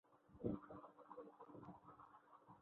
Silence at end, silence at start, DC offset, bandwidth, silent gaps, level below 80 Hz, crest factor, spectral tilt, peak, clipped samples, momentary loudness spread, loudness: 0 s; 0.05 s; under 0.1%; 4 kHz; none; -74 dBFS; 24 dB; -9.5 dB/octave; -32 dBFS; under 0.1%; 17 LU; -55 LUFS